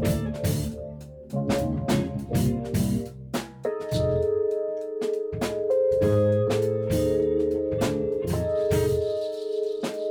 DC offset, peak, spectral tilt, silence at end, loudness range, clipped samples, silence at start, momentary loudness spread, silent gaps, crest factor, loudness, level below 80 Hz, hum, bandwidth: under 0.1%; -12 dBFS; -7 dB/octave; 0 s; 4 LU; under 0.1%; 0 s; 8 LU; none; 12 dB; -26 LUFS; -42 dBFS; none; over 20 kHz